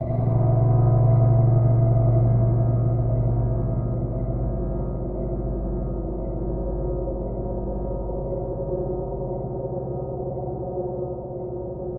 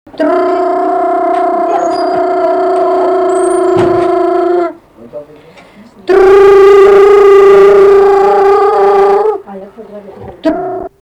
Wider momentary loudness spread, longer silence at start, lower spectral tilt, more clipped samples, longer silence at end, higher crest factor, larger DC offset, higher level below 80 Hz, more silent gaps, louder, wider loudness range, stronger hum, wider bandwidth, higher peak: about the same, 11 LU vs 12 LU; second, 0 s vs 0.15 s; first, -15 dB/octave vs -6 dB/octave; second, under 0.1% vs 0.4%; second, 0 s vs 0.15 s; first, 14 dB vs 8 dB; neither; first, -32 dBFS vs -40 dBFS; neither; second, -24 LUFS vs -7 LUFS; about the same, 9 LU vs 7 LU; neither; second, 2.1 kHz vs 9.6 kHz; second, -8 dBFS vs 0 dBFS